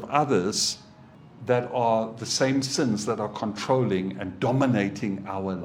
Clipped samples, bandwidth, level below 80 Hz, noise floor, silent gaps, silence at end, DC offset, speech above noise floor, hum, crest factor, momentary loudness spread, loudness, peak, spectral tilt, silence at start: under 0.1%; 16.5 kHz; -64 dBFS; -49 dBFS; none; 0 s; under 0.1%; 24 dB; none; 20 dB; 8 LU; -25 LUFS; -6 dBFS; -4.5 dB/octave; 0 s